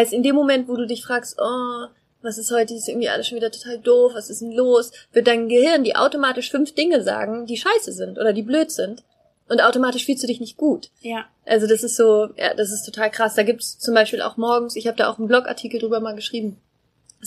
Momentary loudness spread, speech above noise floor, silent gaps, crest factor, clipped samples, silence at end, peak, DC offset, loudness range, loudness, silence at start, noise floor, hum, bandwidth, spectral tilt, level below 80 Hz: 11 LU; 37 dB; none; 18 dB; under 0.1%; 0 s; -2 dBFS; under 0.1%; 4 LU; -20 LUFS; 0 s; -56 dBFS; none; 15.5 kHz; -3 dB/octave; -70 dBFS